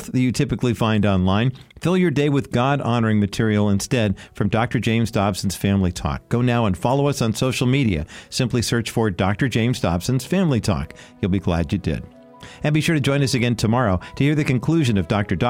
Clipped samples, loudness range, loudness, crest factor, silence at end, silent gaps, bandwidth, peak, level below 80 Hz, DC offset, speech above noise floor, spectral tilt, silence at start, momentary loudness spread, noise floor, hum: under 0.1%; 2 LU; -20 LUFS; 14 dB; 0 s; none; 16.5 kHz; -6 dBFS; -40 dBFS; 0.1%; 22 dB; -6 dB/octave; 0 s; 6 LU; -42 dBFS; none